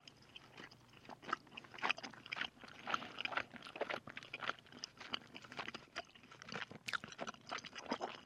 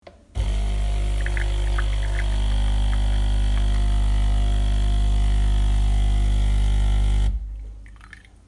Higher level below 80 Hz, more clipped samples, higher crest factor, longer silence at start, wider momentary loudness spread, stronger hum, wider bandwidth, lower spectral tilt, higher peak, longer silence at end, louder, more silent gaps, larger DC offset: second, -80 dBFS vs -20 dBFS; neither; first, 28 dB vs 10 dB; second, 0 s vs 0.35 s; first, 15 LU vs 6 LU; second, none vs 50 Hz at -20 dBFS; first, 15.5 kHz vs 11 kHz; second, -2.5 dB/octave vs -5.5 dB/octave; second, -18 dBFS vs -10 dBFS; second, 0 s vs 0.4 s; second, -45 LUFS vs -24 LUFS; neither; neither